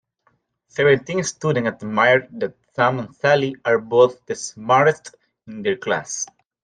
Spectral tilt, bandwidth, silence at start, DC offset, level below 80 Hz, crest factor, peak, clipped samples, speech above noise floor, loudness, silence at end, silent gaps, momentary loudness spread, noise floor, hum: -4.5 dB/octave; 10 kHz; 0.75 s; under 0.1%; -62 dBFS; 18 dB; -2 dBFS; under 0.1%; 46 dB; -20 LUFS; 0.4 s; none; 13 LU; -65 dBFS; none